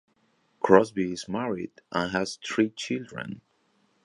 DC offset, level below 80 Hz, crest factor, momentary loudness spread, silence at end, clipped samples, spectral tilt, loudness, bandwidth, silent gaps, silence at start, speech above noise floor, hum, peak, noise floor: under 0.1%; -62 dBFS; 26 dB; 17 LU; 0.65 s; under 0.1%; -5 dB/octave; -27 LUFS; 11 kHz; none; 0.65 s; 42 dB; none; -2 dBFS; -68 dBFS